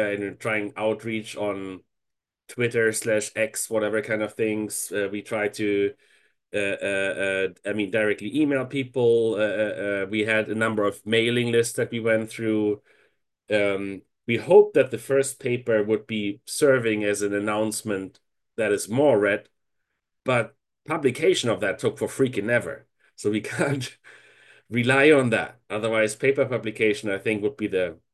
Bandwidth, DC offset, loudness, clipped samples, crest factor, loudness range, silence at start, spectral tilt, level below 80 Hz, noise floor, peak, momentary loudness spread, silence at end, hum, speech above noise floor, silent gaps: 12.5 kHz; under 0.1%; -24 LUFS; under 0.1%; 20 dB; 4 LU; 0 s; -4.5 dB/octave; -64 dBFS; -83 dBFS; -4 dBFS; 9 LU; 0.2 s; none; 60 dB; none